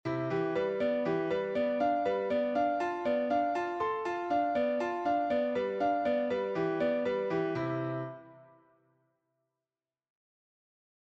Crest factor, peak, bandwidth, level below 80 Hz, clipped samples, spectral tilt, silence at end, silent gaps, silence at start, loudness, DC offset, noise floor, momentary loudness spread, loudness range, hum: 12 dB; -20 dBFS; 7.8 kHz; -70 dBFS; under 0.1%; -7.5 dB/octave; 2.6 s; none; 0.05 s; -31 LUFS; under 0.1%; under -90 dBFS; 3 LU; 8 LU; none